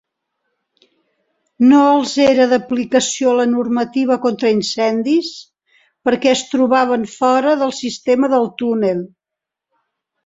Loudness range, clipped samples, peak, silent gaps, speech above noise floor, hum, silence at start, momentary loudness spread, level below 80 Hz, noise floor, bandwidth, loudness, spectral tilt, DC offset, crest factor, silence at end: 3 LU; under 0.1%; -2 dBFS; none; 69 dB; none; 1.6 s; 8 LU; -60 dBFS; -84 dBFS; 8 kHz; -15 LUFS; -4 dB/octave; under 0.1%; 14 dB; 1.2 s